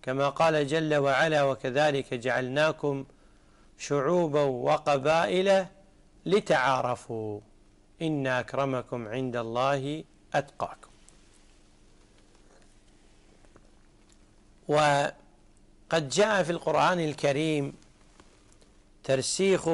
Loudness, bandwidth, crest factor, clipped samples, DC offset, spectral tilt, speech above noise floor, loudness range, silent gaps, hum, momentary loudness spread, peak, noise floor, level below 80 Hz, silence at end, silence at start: -27 LUFS; 11.5 kHz; 14 dB; under 0.1%; under 0.1%; -5 dB/octave; 31 dB; 7 LU; none; none; 13 LU; -14 dBFS; -58 dBFS; -60 dBFS; 0 s; 0.05 s